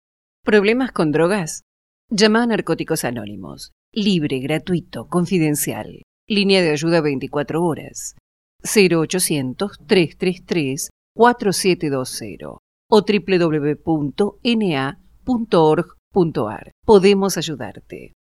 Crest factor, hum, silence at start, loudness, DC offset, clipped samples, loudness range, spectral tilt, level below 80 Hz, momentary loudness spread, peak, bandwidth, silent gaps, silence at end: 18 dB; none; 0.45 s; -18 LUFS; under 0.1%; under 0.1%; 3 LU; -5 dB/octave; -50 dBFS; 16 LU; 0 dBFS; 15 kHz; 1.62-2.08 s, 3.72-3.92 s, 6.03-6.27 s, 8.20-8.59 s, 10.90-11.15 s, 12.59-12.89 s, 15.99-16.11 s, 16.72-16.83 s; 0.25 s